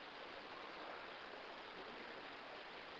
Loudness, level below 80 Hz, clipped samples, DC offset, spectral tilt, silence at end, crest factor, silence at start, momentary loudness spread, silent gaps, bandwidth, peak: -52 LUFS; -80 dBFS; under 0.1%; under 0.1%; 0 dB/octave; 0 s; 14 dB; 0 s; 1 LU; none; 7.6 kHz; -38 dBFS